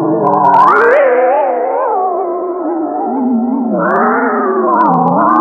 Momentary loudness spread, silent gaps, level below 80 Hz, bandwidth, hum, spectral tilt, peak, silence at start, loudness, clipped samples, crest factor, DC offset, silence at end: 9 LU; none; -58 dBFS; 7.2 kHz; none; -9 dB/octave; 0 dBFS; 0 s; -11 LUFS; under 0.1%; 10 dB; under 0.1%; 0 s